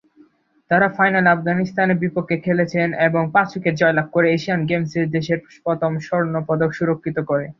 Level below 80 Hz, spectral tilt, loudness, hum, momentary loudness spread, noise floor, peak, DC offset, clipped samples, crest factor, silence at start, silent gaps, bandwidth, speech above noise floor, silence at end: -58 dBFS; -7.5 dB/octave; -19 LUFS; none; 6 LU; -54 dBFS; -2 dBFS; under 0.1%; under 0.1%; 18 dB; 0.7 s; none; 7.2 kHz; 36 dB; 0.05 s